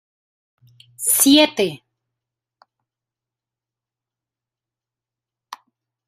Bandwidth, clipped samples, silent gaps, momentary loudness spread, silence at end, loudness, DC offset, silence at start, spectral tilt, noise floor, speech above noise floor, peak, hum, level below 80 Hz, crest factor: 16 kHz; under 0.1%; none; 12 LU; 0.55 s; -15 LUFS; under 0.1%; 1 s; -1.5 dB/octave; -88 dBFS; 72 dB; 0 dBFS; none; -68 dBFS; 24 dB